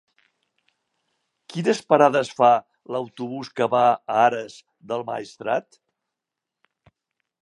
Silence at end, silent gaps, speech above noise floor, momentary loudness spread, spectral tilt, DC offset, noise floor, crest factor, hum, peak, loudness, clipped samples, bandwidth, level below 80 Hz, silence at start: 1.85 s; none; 64 dB; 14 LU; -5.5 dB/octave; under 0.1%; -85 dBFS; 22 dB; none; -2 dBFS; -22 LUFS; under 0.1%; 11.5 kHz; -76 dBFS; 1.5 s